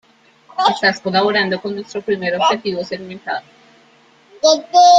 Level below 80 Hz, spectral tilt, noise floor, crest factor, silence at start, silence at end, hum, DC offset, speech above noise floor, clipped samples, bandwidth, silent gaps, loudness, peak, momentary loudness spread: -64 dBFS; -3 dB/octave; -51 dBFS; 16 dB; 0.55 s; 0 s; none; under 0.1%; 35 dB; under 0.1%; 7.8 kHz; none; -17 LUFS; 0 dBFS; 12 LU